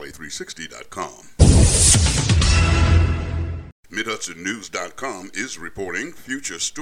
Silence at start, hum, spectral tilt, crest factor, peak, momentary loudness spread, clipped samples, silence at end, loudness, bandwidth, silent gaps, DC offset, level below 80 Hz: 0 s; none; -4 dB/octave; 20 dB; 0 dBFS; 18 LU; under 0.1%; 0 s; -19 LUFS; 14.5 kHz; 3.72-3.83 s; under 0.1%; -26 dBFS